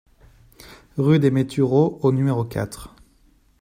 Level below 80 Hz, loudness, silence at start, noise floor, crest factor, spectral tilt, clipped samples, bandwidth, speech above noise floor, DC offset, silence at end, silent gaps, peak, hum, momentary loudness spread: -52 dBFS; -20 LUFS; 0.95 s; -57 dBFS; 18 dB; -8 dB/octave; under 0.1%; 16 kHz; 38 dB; under 0.1%; 0.75 s; none; -4 dBFS; none; 14 LU